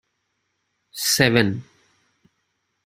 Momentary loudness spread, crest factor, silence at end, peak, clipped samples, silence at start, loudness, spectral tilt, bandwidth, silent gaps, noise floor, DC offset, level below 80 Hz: 18 LU; 24 dB; 1.25 s; -2 dBFS; under 0.1%; 0.95 s; -19 LUFS; -3.5 dB/octave; 15.5 kHz; none; -74 dBFS; under 0.1%; -56 dBFS